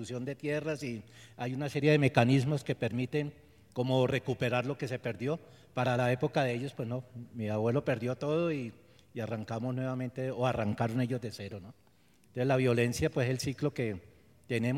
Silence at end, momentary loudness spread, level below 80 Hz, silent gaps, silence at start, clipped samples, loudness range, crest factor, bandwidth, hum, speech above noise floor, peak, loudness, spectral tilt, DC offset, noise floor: 0 s; 14 LU; -62 dBFS; none; 0 s; under 0.1%; 4 LU; 24 dB; 14.5 kHz; none; 34 dB; -8 dBFS; -32 LUFS; -6.5 dB/octave; under 0.1%; -65 dBFS